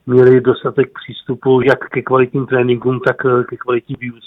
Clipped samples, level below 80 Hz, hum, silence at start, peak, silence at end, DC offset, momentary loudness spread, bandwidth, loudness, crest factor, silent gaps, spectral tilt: under 0.1%; -52 dBFS; none; 0.05 s; 0 dBFS; 0.15 s; under 0.1%; 10 LU; 4.8 kHz; -14 LUFS; 14 dB; none; -9 dB/octave